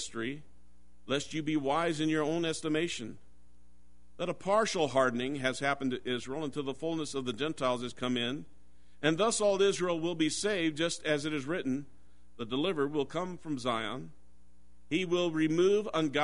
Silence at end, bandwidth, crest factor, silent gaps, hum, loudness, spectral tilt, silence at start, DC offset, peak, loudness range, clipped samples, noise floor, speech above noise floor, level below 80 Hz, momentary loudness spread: 0 s; 10.5 kHz; 20 dB; none; none; -32 LUFS; -4.5 dB/octave; 0 s; 0.5%; -12 dBFS; 4 LU; under 0.1%; -64 dBFS; 32 dB; -64 dBFS; 10 LU